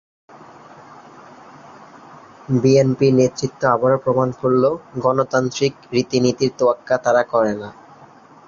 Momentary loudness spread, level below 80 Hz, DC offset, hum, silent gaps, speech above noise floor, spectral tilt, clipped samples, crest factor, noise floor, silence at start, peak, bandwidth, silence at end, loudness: 7 LU; -56 dBFS; under 0.1%; none; none; 28 dB; -6 dB/octave; under 0.1%; 16 dB; -45 dBFS; 0.9 s; -2 dBFS; 7.4 kHz; 0.75 s; -18 LUFS